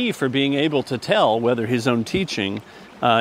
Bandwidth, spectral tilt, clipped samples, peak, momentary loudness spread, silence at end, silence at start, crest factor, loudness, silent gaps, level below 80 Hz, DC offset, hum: 16 kHz; -5.5 dB/octave; under 0.1%; -4 dBFS; 6 LU; 0 s; 0 s; 18 dB; -21 LUFS; none; -54 dBFS; under 0.1%; none